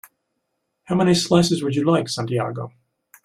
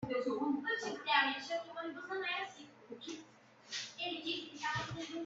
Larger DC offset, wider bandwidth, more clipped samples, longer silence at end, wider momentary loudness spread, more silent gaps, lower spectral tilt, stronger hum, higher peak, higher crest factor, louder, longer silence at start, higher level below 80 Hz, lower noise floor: neither; first, 14.5 kHz vs 8 kHz; neither; first, 0.55 s vs 0 s; second, 12 LU vs 16 LU; neither; first, -5.5 dB/octave vs -3.5 dB/octave; neither; first, -4 dBFS vs -18 dBFS; about the same, 18 dB vs 22 dB; first, -20 LUFS vs -38 LUFS; first, 0.9 s vs 0 s; first, -56 dBFS vs -74 dBFS; first, -75 dBFS vs -61 dBFS